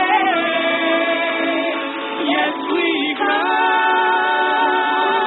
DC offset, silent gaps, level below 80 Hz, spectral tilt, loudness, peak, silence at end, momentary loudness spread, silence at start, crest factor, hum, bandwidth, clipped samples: under 0.1%; none; -70 dBFS; -8 dB/octave; -17 LUFS; -4 dBFS; 0 s; 4 LU; 0 s; 14 dB; none; 4.2 kHz; under 0.1%